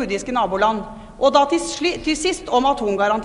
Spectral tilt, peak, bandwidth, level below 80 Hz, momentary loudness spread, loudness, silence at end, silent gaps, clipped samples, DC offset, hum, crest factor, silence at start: -3.5 dB/octave; -2 dBFS; 11 kHz; -44 dBFS; 6 LU; -19 LUFS; 0 s; none; under 0.1%; under 0.1%; none; 18 dB; 0 s